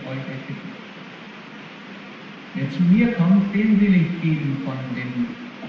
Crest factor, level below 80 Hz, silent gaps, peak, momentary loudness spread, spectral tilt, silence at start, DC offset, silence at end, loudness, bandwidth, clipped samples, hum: 14 dB; -54 dBFS; none; -6 dBFS; 21 LU; -9 dB/octave; 0 s; under 0.1%; 0 s; -21 LUFS; 6.4 kHz; under 0.1%; none